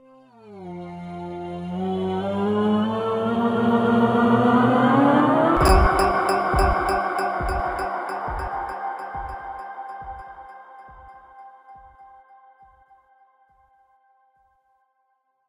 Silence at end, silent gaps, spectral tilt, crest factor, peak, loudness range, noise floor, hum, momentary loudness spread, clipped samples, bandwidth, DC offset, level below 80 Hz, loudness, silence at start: 3.45 s; none; -6.5 dB/octave; 18 dB; -4 dBFS; 19 LU; -70 dBFS; none; 19 LU; under 0.1%; 16.5 kHz; under 0.1%; -34 dBFS; -21 LUFS; 0.45 s